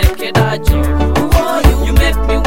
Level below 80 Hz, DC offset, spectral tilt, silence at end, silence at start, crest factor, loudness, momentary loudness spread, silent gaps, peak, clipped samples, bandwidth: -14 dBFS; 6%; -6 dB/octave; 0 s; 0 s; 12 dB; -13 LUFS; 3 LU; none; 0 dBFS; 0.3%; 16.5 kHz